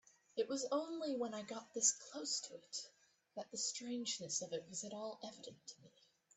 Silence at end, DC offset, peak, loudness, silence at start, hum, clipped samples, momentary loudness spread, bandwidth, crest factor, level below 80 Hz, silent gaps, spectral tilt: 0.5 s; under 0.1%; -22 dBFS; -42 LUFS; 0.35 s; none; under 0.1%; 19 LU; 8.8 kHz; 24 dB; under -90 dBFS; none; -1.5 dB/octave